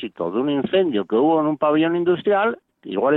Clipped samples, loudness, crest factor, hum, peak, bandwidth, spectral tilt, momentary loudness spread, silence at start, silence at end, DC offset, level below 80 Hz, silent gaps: under 0.1%; -20 LUFS; 14 dB; none; -6 dBFS; 4.1 kHz; -9.5 dB/octave; 6 LU; 0 s; 0 s; under 0.1%; -62 dBFS; none